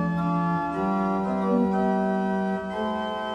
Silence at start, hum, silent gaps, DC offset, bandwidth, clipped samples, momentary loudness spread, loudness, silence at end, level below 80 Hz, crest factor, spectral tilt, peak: 0 s; none; none; under 0.1%; 8.2 kHz; under 0.1%; 5 LU; -25 LUFS; 0 s; -52 dBFS; 12 dB; -8.5 dB/octave; -12 dBFS